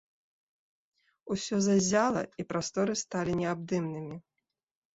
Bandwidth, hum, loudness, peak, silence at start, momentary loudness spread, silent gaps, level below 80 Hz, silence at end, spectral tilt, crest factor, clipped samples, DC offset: 8 kHz; none; -30 LUFS; -12 dBFS; 1.25 s; 12 LU; none; -64 dBFS; 0.75 s; -5 dB/octave; 20 dB; under 0.1%; under 0.1%